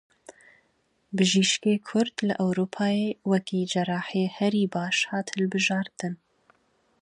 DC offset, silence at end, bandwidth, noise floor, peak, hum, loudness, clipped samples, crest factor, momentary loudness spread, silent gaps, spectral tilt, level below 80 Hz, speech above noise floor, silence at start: under 0.1%; 0.85 s; 10.5 kHz; -70 dBFS; -8 dBFS; none; -26 LUFS; under 0.1%; 18 dB; 7 LU; none; -4.5 dB/octave; -72 dBFS; 44 dB; 0.3 s